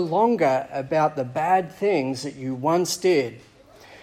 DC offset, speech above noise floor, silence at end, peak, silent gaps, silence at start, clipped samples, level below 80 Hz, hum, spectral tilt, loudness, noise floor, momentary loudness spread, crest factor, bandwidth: under 0.1%; 26 dB; 0.05 s; -8 dBFS; none; 0 s; under 0.1%; -64 dBFS; none; -5 dB/octave; -23 LUFS; -48 dBFS; 8 LU; 16 dB; 16 kHz